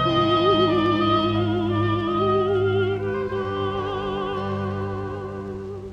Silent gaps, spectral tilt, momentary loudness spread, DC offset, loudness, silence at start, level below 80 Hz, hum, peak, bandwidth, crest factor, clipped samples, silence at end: none; -8 dB/octave; 12 LU; under 0.1%; -23 LUFS; 0 s; -46 dBFS; none; -8 dBFS; 7.6 kHz; 14 dB; under 0.1%; 0 s